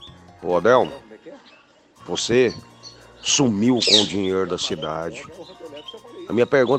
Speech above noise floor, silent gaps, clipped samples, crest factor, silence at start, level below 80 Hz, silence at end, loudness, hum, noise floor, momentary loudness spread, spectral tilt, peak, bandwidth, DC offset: 33 dB; none; under 0.1%; 20 dB; 0 s; -56 dBFS; 0 s; -19 LUFS; none; -53 dBFS; 23 LU; -3.5 dB/octave; -2 dBFS; 9.8 kHz; under 0.1%